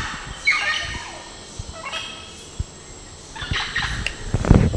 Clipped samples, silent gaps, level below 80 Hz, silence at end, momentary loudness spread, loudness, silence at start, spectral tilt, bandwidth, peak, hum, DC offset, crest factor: under 0.1%; none; -30 dBFS; 0 s; 18 LU; -24 LUFS; 0 s; -4.5 dB/octave; 11 kHz; 0 dBFS; none; under 0.1%; 24 dB